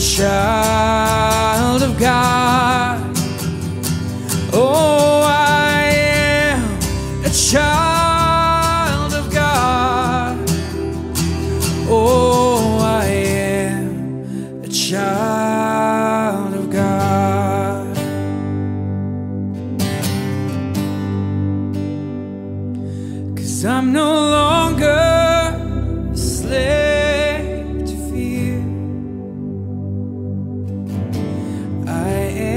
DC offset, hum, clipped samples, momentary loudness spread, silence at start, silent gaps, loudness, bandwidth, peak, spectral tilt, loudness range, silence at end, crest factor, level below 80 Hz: under 0.1%; none; under 0.1%; 12 LU; 0 s; none; -17 LUFS; 16 kHz; -2 dBFS; -4.5 dB/octave; 8 LU; 0 s; 16 dB; -32 dBFS